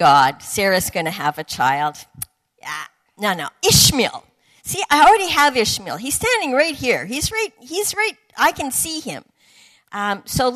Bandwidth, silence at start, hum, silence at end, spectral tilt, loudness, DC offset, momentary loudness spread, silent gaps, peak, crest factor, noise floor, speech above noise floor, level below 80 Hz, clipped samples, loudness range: 14 kHz; 0 s; none; 0 s; -2.5 dB/octave; -18 LUFS; under 0.1%; 20 LU; none; 0 dBFS; 18 dB; -52 dBFS; 34 dB; -44 dBFS; under 0.1%; 6 LU